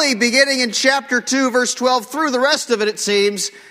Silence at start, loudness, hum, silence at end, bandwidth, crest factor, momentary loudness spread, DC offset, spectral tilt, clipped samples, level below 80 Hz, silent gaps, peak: 0 s; -16 LUFS; none; 0.1 s; 16 kHz; 16 dB; 5 LU; under 0.1%; -1.5 dB/octave; under 0.1%; -66 dBFS; none; 0 dBFS